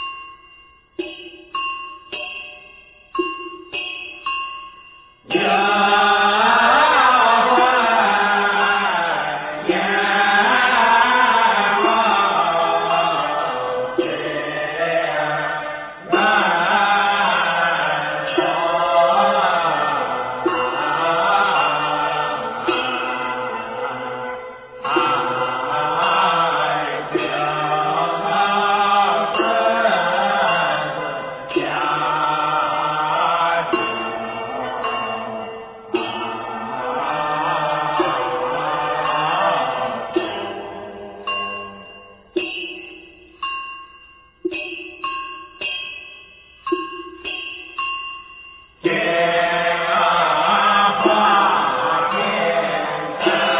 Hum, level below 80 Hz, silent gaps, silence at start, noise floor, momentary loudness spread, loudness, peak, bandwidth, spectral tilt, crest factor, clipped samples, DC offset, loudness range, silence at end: none; -56 dBFS; none; 0 s; -48 dBFS; 15 LU; -18 LUFS; -2 dBFS; 4 kHz; -7.5 dB/octave; 18 dB; under 0.1%; under 0.1%; 13 LU; 0 s